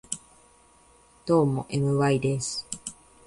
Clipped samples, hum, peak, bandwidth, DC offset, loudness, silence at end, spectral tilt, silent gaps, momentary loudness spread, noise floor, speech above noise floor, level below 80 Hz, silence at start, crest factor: under 0.1%; none; -10 dBFS; 11.5 kHz; under 0.1%; -26 LUFS; 0.35 s; -5.5 dB/octave; none; 14 LU; -58 dBFS; 33 dB; -58 dBFS; 0.1 s; 18 dB